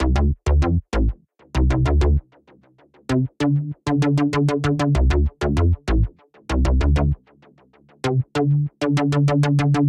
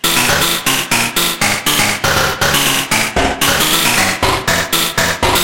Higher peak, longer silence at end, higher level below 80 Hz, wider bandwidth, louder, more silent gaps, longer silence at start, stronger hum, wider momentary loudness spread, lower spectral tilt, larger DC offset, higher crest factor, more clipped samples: second, -8 dBFS vs 0 dBFS; about the same, 0 s vs 0 s; first, -24 dBFS vs -32 dBFS; second, 10.5 kHz vs 17 kHz; second, -21 LUFS vs -12 LUFS; neither; about the same, 0 s vs 0.05 s; neither; first, 7 LU vs 3 LU; first, -7.5 dB/octave vs -2 dB/octave; second, under 0.1% vs 0.7%; about the same, 12 dB vs 14 dB; neither